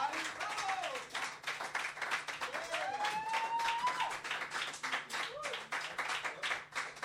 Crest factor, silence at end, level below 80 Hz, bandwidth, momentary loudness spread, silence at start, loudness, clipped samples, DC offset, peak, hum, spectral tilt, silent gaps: 18 dB; 0 s; -76 dBFS; 16 kHz; 5 LU; 0 s; -38 LUFS; under 0.1%; under 0.1%; -22 dBFS; none; -0.5 dB/octave; none